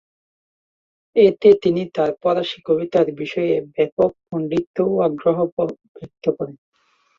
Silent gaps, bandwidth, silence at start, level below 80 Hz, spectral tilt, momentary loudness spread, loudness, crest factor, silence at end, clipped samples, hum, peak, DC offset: 3.92-3.97 s, 4.67-4.74 s, 5.52-5.57 s, 5.89-5.95 s; 7.2 kHz; 1.15 s; -60 dBFS; -8 dB/octave; 11 LU; -19 LUFS; 18 dB; 0.65 s; under 0.1%; none; -2 dBFS; under 0.1%